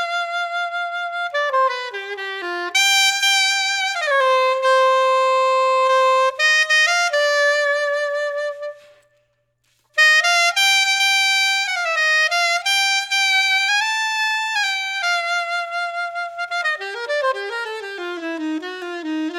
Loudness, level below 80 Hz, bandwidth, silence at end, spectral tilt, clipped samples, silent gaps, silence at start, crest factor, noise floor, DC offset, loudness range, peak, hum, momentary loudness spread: -17 LUFS; -78 dBFS; 20 kHz; 0 s; 2 dB/octave; under 0.1%; none; 0 s; 16 dB; -66 dBFS; under 0.1%; 7 LU; -4 dBFS; none; 12 LU